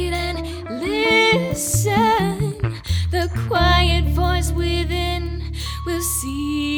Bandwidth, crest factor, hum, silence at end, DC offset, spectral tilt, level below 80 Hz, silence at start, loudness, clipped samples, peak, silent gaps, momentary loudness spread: 19 kHz; 18 dB; none; 0 s; under 0.1%; -4.5 dB/octave; -26 dBFS; 0 s; -20 LUFS; under 0.1%; -2 dBFS; none; 11 LU